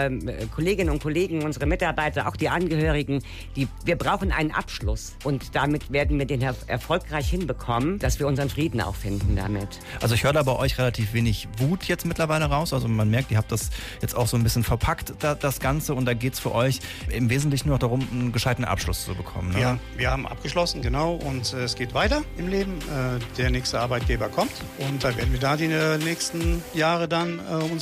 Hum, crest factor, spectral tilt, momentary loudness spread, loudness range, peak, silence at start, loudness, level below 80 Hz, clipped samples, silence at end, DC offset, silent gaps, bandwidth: none; 14 dB; -5.5 dB/octave; 6 LU; 2 LU; -10 dBFS; 0 s; -25 LUFS; -34 dBFS; under 0.1%; 0 s; under 0.1%; none; 15.5 kHz